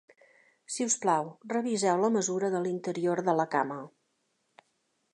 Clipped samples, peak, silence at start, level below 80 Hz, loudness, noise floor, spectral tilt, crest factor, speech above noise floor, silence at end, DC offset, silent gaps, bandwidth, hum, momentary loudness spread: under 0.1%; -12 dBFS; 0.7 s; -82 dBFS; -29 LUFS; -76 dBFS; -4 dB/octave; 18 dB; 47 dB; 1.25 s; under 0.1%; none; 11.5 kHz; none; 8 LU